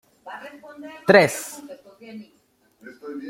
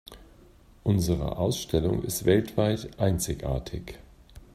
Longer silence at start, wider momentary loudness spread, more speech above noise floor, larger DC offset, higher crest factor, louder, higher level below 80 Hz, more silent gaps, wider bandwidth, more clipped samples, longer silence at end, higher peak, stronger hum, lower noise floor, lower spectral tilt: first, 0.25 s vs 0.1 s; first, 27 LU vs 9 LU; first, 37 dB vs 28 dB; neither; about the same, 24 dB vs 20 dB; first, -18 LUFS vs -27 LUFS; second, -68 dBFS vs -42 dBFS; neither; about the same, 16.5 kHz vs 16 kHz; neither; second, 0 s vs 0.15 s; first, 0 dBFS vs -8 dBFS; neither; first, -59 dBFS vs -54 dBFS; second, -4.5 dB/octave vs -6 dB/octave